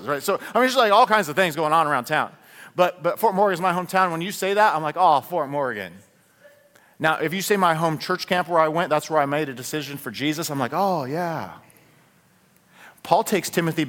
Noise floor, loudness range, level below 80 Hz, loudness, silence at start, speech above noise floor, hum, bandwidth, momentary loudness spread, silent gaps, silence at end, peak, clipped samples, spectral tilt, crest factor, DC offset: -58 dBFS; 6 LU; -68 dBFS; -22 LUFS; 0 s; 37 dB; none; 18 kHz; 10 LU; none; 0 s; -2 dBFS; under 0.1%; -4.5 dB/octave; 20 dB; under 0.1%